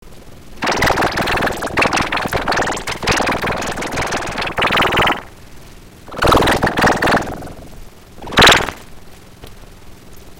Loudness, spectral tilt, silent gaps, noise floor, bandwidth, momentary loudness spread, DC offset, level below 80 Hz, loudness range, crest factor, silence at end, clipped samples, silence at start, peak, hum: -15 LUFS; -3.5 dB/octave; none; -38 dBFS; 17 kHz; 12 LU; under 0.1%; -32 dBFS; 3 LU; 18 dB; 0 s; under 0.1%; 0.05 s; 0 dBFS; none